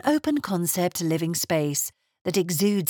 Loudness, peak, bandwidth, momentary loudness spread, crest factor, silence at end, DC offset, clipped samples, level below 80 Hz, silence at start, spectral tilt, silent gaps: -25 LUFS; -10 dBFS; over 20 kHz; 5 LU; 14 dB; 0 s; under 0.1%; under 0.1%; -66 dBFS; 0.05 s; -4.5 dB/octave; 2.21-2.25 s